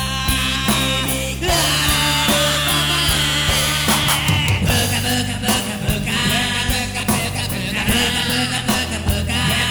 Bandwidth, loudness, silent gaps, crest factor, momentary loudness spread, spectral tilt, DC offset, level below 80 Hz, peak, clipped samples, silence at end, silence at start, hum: over 20 kHz; -17 LUFS; none; 12 dB; 5 LU; -3 dB/octave; under 0.1%; -30 dBFS; -6 dBFS; under 0.1%; 0 s; 0 s; none